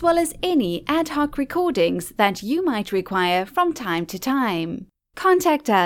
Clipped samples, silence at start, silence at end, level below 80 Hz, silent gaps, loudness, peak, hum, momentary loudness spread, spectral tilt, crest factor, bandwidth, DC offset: under 0.1%; 0 s; 0 s; -50 dBFS; none; -22 LUFS; -4 dBFS; none; 7 LU; -4.5 dB/octave; 18 dB; 17.5 kHz; under 0.1%